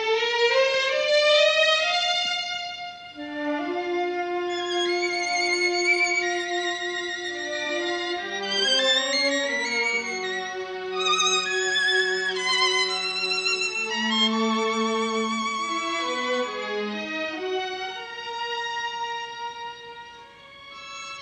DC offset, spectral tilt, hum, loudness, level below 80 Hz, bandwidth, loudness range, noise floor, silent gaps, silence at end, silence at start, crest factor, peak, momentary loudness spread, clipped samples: under 0.1%; -1.5 dB/octave; none; -23 LUFS; -70 dBFS; 10 kHz; 7 LU; -46 dBFS; none; 0 s; 0 s; 18 dB; -8 dBFS; 13 LU; under 0.1%